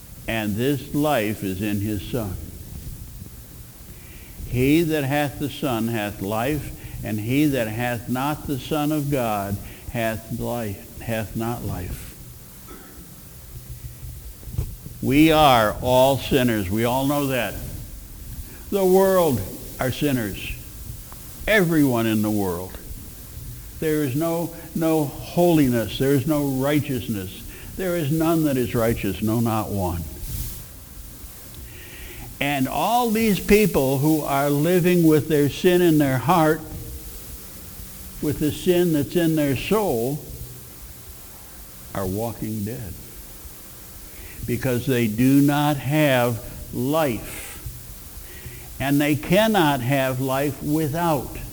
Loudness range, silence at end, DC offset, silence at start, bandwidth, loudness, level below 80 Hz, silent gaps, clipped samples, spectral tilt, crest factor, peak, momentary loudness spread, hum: 10 LU; 0 s; under 0.1%; 0 s; over 20 kHz; -22 LUFS; -42 dBFS; none; under 0.1%; -6 dB/octave; 20 dB; -4 dBFS; 20 LU; none